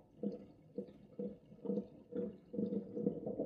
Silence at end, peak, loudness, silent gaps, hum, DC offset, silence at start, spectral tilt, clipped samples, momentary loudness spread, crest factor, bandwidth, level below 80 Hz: 0 s; -22 dBFS; -44 LUFS; none; none; under 0.1%; 0 s; -11 dB/octave; under 0.1%; 10 LU; 22 dB; 5 kHz; -76 dBFS